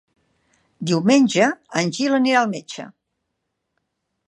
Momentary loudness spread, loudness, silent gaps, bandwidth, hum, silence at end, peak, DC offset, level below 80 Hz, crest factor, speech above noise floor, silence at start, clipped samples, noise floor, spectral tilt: 18 LU; -18 LUFS; none; 11 kHz; none; 1.35 s; -2 dBFS; under 0.1%; -70 dBFS; 18 dB; 58 dB; 0.8 s; under 0.1%; -77 dBFS; -4.5 dB/octave